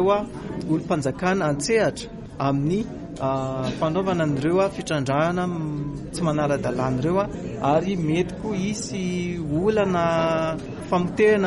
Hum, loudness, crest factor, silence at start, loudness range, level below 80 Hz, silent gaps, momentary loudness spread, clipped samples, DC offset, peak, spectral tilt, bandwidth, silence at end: none; -24 LUFS; 14 dB; 0 s; 1 LU; -46 dBFS; none; 7 LU; under 0.1%; under 0.1%; -8 dBFS; -6 dB/octave; 11.5 kHz; 0 s